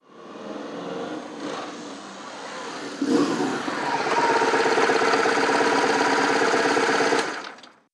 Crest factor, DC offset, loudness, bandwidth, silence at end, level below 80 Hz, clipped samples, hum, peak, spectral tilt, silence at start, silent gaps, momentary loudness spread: 18 dB; under 0.1%; -22 LUFS; 12.5 kHz; 0.25 s; -70 dBFS; under 0.1%; none; -4 dBFS; -3 dB/octave; 0.15 s; none; 17 LU